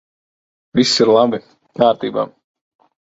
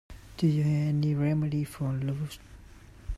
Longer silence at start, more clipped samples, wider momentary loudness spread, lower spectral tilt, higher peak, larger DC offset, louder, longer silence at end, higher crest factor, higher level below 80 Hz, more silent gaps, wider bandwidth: first, 0.75 s vs 0.1 s; neither; about the same, 15 LU vs 17 LU; second, -4.5 dB/octave vs -8 dB/octave; first, 0 dBFS vs -14 dBFS; neither; first, -16 LUFS vs -29 LUFS; first, 0.8 s vs 0 s; about the same, 18 dB vs 16 dB; second, -56 dBFS vs -46 dBFS; neither; second, 8 kHz vs 13.5 kHz